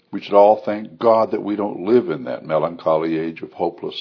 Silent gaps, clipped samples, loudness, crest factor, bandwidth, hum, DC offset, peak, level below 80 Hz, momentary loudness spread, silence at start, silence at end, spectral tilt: none; under 0.1%; -19 LUFS; 18 dB; 5.4 kHz; none; under 0.1%; 0 dBFS; -66 dBFS; 11 LU; 0.1 s; 0 s; -8.5 dB/octave